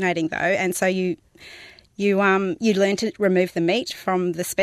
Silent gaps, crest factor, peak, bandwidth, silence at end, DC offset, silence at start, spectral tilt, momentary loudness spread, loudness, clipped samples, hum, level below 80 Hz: none; 16 dB; -6 dBFS; 14.5 kHz; 0 s; under 0.1%; 0 s; -5 dB/octave; 8 LU; -21 LUFS; under 0.1%; none; -62 dBFS